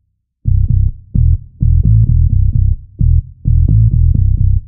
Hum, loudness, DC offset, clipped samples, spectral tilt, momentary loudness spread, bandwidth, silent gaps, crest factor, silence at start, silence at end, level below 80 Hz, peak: none; -13 LUFS; under 0.1%; under 0.1%; -19.5 dB/octave; 6 LU; 0.7 kHz; none; 10 dB; 0.45 s; 0 s; -14 dBFS; 0 dBFS